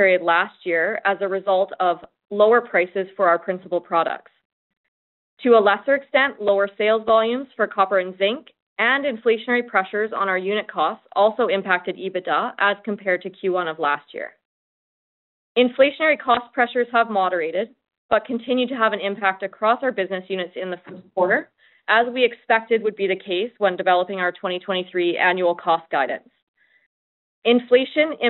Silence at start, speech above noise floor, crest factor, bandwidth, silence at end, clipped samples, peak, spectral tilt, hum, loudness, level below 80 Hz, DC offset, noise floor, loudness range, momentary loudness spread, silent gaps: 0 s; over 70 dB; 18 dB; 4.2 kHz; 0 s; under 0.1%; -2 dBFS; -1.5 dB/octave; none; -21 LUFS; -70 dBFS; under 0.1%; under -90 dBFS; 3 LU; 9 LU; 4.45-4.70 s, 4.77-5.37 s, 8.62-8.76 s, 14.45-15.55 s, 17.98-18.09 s, 26.42-26.54 s, 26.86-27.42 s